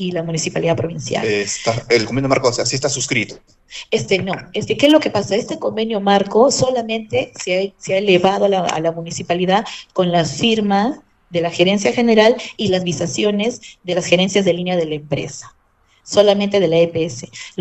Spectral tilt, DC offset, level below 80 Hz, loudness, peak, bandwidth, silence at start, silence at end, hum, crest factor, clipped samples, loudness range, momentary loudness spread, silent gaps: -4.5 dB/octave; under 0.1%; -50 dBFS; -17 LUFS; 0 dBFS; 9 kHz; 0 s; 0 s; none; 18 dB; under 0.1%; 2 LU; 10 LU; none